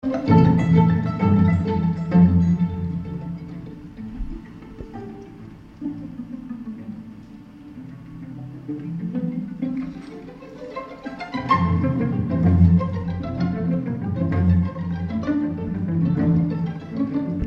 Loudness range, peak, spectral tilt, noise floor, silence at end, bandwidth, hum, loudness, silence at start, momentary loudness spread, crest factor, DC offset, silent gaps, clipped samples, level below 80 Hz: 16 LU; -4 dBFS; -10 dB/octave; -41 dBFS; 0 s; 5.6 kHz; none; -21 LUFS; 0.05 s; 22 LU; 18 dB; under 0.1%; none; under 0.1%; -40 dBFS